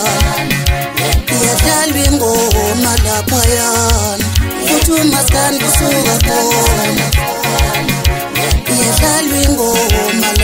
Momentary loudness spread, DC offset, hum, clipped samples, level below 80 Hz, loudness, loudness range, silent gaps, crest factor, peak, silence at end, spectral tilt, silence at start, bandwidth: 4 LU; under 0.1%; none; under 0.1%; -18 dBFS; -11 LUFS; 1 LU; none; 12 dB; 0 dBFS; 0 s; -3.5 dB/octave; 0 s; 16.5 kHz